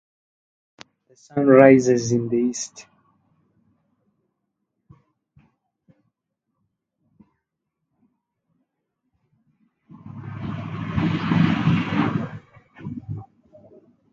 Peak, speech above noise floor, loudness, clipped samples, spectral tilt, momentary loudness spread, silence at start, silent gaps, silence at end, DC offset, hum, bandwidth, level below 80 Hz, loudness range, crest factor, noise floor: 0 dBFS; 63 dB; -20 LUFS; under 0.1%; -6.5 dB/octave; 23 LU; 1.35 s; none; 0.9 s; under 0.1%; none; 8.8 kHz; -52 dBFS; 18 LU; 24 dB; -80 dBFS